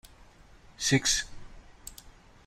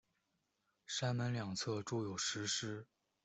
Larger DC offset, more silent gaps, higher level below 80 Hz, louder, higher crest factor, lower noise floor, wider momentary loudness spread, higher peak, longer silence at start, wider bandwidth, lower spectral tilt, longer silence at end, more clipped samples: neither; neither; first, -50 dBFS vs -76 dBFS; first, -27 LUFS vs -40 LUFS; first, 22 dB vs 16 dB; second, -55 dBFS vs -84 dBFS; first, 22 LU vs 6 LU; first, -10 dBFS vs -26 dBFS; second, 0.05 s vs 0.9 s; first, 16 kHz vs 8.2 kHz; second, -2.5 dB/octave vs -4 dB/octave; about the same, 0.35 s vs 0.4 s; neither